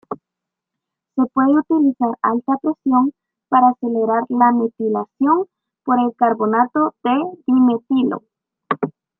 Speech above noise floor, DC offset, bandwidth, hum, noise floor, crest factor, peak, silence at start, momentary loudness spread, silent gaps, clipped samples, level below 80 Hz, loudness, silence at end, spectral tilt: 67 dB; under 0.1%; 3.9 kHz; none; -83 dBFS; 16 dB; -2 dBFS; 0.1 s; 9 LU; none; under 0.1%; -70 dBFS; -18 LUFS; 0.3 s; -10 dB/octave